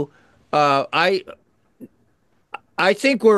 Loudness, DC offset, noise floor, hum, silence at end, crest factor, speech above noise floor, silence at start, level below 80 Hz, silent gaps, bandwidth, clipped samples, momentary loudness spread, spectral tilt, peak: -19 LUFS; under 0.1%; -64 dBFS; none; 0 s; 18 dB; 47 dB; 0 s; -68 dBFS; none; 12.5 kHz; under 0.1%; 16 LU; -4.5 dB/octave; -2 dBFS